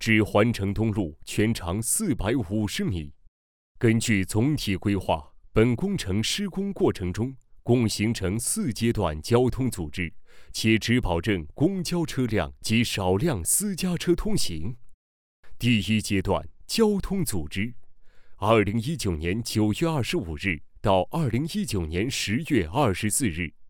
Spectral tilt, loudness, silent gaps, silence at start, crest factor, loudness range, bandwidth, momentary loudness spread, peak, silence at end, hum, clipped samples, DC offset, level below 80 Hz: -5 dB/octave; -25 LUFS; 3.28-3.75 s, 14.94-15.43 s; 0 s; 20 dB; 2 LU; over 20 kHz; 7 LU; -6 dBFS; 0 s; none; under 0.1%; under 0.1%; -44 dBFS